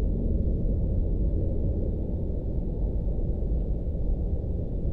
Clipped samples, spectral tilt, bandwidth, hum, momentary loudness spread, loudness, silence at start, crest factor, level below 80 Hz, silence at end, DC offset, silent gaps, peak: under 0.1%; -13 dB/octave; 1.1 kHz; none; 3 LU; -30 LUFS; 0 s; 10 dB; -28 dBFS; 0 s; under 0.1%; none; -16 dBFS